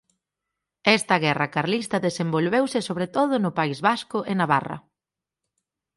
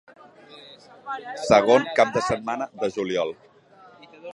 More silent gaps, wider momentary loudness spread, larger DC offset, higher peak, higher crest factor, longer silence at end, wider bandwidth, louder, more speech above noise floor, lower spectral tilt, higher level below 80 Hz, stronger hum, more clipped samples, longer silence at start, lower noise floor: neither; second, 6 LU vs 25 LU; neither; about the same, -4 dBFS vs -2 dBFS; about the same, 20 dB vs 22 dB; first, 1.2 s vs 0 s; about the same, 11.5 kHz vs 11.5 kHz; about the same, -23 LUFS vs -22 LUFS; first, 66 dB vs 30 dB; about the same, -5 dB/octave vs -4.5 dB/octave; second, -66 dBFS vs -58 dBFS; neither; neither; first, 0.85 s vs 0.5 s; first, -89 dBFS vs -52 dBFS